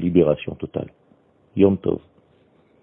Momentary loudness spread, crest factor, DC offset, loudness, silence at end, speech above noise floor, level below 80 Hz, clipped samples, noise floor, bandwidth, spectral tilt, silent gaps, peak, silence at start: 14 LU; 20 dB; under 0.1%; -22 LUFS; 0.85 s; 38 dB; -50 dBFS; under 0.1%; -58 dBFS; 3.6 kHz; -12 dB/octave; none; -2 dBFS; 0 s